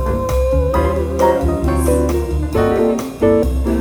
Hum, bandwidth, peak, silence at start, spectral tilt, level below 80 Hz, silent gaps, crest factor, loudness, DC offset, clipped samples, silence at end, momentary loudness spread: none; over 20 kHz; -2 dBFS; 0 s; -7 dB/octave; -20 dBFS; none; 14 dB; -16 LUFS; under 0.1%; under 0.1%; 0 s; 3 LU